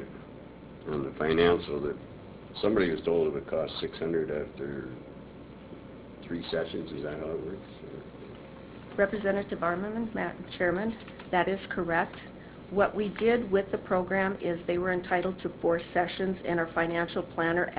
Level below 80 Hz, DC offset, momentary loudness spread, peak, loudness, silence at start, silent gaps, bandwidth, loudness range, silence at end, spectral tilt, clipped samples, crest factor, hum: -54 dBFS; under 0.1%; 19 LU; -10 dBFS; -30 LUFS; 0 s; none; 4 kHz; 8 LU; 0 s; -4.5 dB/octave; under 0.1%; 22 dB; none